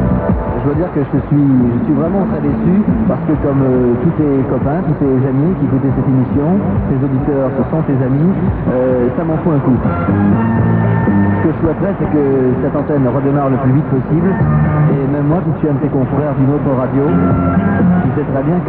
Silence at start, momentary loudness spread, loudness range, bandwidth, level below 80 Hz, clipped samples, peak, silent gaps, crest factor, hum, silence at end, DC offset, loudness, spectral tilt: 0 s; 3 LU; 1 LU; 4.1 kHz; -30 dBFS; under 0.1%; -2 dBFS; none; 12 dB; none; 0 s; under 0.1%; -13 LUFS; -10.5 dB/octave